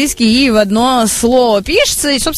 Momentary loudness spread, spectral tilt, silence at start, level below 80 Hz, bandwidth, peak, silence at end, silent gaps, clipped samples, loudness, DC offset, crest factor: 1 LU; -3 dB/octave; 0 s; -32 dBFS; 15.5 kHz; 0 dBFS; 0 s; none; under 0.1%; -11 LUFS; under 0.1%; 12 dB